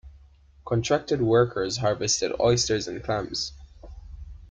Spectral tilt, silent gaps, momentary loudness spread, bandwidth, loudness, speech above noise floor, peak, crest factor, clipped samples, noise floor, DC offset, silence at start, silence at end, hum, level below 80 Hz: -4 dB/octave; none; 19 LU; 9.6 kHz; -25 LUFS; 29 dB; -10 dBFS; 16 dB; under 0.1%; -54 dBFS; under 0.1%; 0.05 s; 0.05 s; none; -46 dBFS